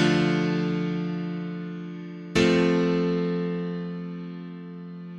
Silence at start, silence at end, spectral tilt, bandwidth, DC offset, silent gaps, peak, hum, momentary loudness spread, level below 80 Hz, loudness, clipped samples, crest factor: 0 s; 0 s; -6.5 dB/octave; 9.4 kHz; under 0.1%; none; -6 dBFS; none; 16 LU; -54 dBFS; -26 LUFS; under 0.1%; 20 dB